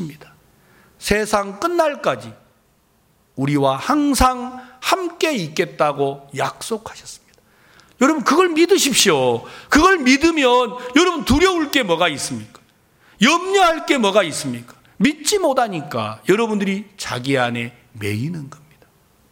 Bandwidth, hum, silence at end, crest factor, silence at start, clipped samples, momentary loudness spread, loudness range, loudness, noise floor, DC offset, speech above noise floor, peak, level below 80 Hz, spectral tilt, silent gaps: 17 kHz; none; 0.75 s; 18 dB; 0 s; under 0.1%; 14 LU; 7 LU; -18 LUFS; -59 dBFS; under 0.1%; 41 dB; 0 dBFS; -40 dBFS; -3.5 dB/octave; none